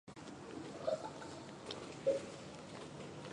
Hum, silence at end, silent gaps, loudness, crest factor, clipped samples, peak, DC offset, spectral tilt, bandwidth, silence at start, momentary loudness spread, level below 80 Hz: none; 0 s; none; -44 LUFS; 20 dB; under 0.1%; -24 dBFS; under 0.1%; -5 dB/octave; 11 kHz; 0.05 s; 12 LU; -72 dBFS